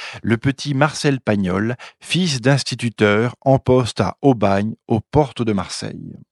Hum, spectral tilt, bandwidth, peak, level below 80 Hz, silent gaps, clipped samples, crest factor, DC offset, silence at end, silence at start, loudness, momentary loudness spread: none; -6 dB/octave; 12 kHz; 0 dBFS; -46 dBFS; none; under 0.1%; 18 dB; under 0.1%; 0.15 s; 0 s; -19 LUFS; 7 LU